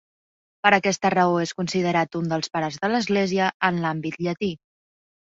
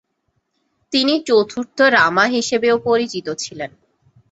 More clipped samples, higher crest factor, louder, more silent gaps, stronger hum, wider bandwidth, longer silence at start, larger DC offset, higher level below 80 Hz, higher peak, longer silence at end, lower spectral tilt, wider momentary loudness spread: neither; about the same, 22 dB vs 18 dB; second, -23 LUFS vs -17 LUFS; first, 3.54-3.60 s vs none; neither; about the same, 8 kHz vs 8.2 kHz; second, 0.65 s vs 0.9 s; neither; about the same, -62 dBFS vs -60 dBFS; about the same, -2 dBFS vs -2 dBFS; about the same, 0.65 s vs 0.65 s; first, -5 dB/octave vs -3 dB/octave; second, 8 LU vs 13 LU